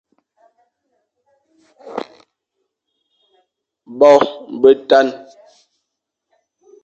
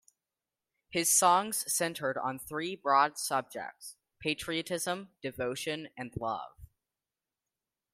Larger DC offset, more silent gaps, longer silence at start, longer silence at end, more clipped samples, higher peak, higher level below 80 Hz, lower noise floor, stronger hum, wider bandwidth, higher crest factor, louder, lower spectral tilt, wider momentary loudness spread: neither; neither; first, 1.85 s vs 0.9 s; first, 1.7 s vs 1.3 s; neither; first, 0 dBFS vs -12 dBFS; about the same, -64 dBFS vs -66 dBFS; second, -78 dBFS vs under -90 dBFS; neither; second, 7.8 kHz vs 16 kHz; about the same, 20 dB vs 22 dB; first, -13 LUFS vs -31 LUFS; first, -4.5 dB/octave vs -2 dB/octave; first, 26 LU vs 16 LU